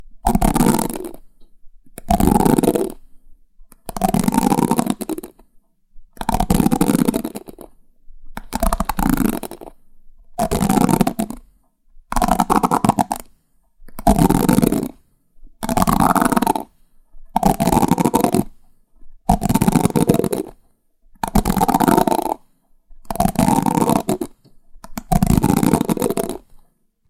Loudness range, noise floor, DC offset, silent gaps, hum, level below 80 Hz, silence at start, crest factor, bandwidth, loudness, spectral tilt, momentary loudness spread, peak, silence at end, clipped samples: 4 LU; -56 dBFS; under 0.1%; none; none; -30 dBFS; 0 s; 18 dB; 17 kHz; -18 LUFS; -6 dB/octave; 16 LU; 0 dBFS; 0.7 s; under 0.1%